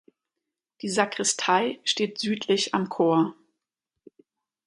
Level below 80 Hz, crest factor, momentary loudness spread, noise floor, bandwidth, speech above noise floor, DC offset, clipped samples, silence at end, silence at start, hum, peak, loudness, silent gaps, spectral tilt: -74 dBFS; 22 dB; 6 LU; -86 dBFS; 11.5 kHz; 61 dB; under 0.1%; under 0.1%; 1.35 s; 0.85 s; none; -6 dBFS; -25 LUFS; none; -3 dB/octave